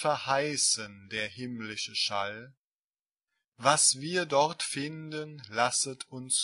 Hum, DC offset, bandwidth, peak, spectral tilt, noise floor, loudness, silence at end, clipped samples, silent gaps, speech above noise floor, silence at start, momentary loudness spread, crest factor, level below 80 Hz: none; under 0.1%; 11.5 kHz; -8 dBFS; -1.5 dB/octave; under -90 dBFS; -29 LUFS; 0 s; under 0.1%; 2.57-2.88 s, 3.48-3.52 s; over 60 dB; 0 s; 15 LU; 24 dB; -74 dBFS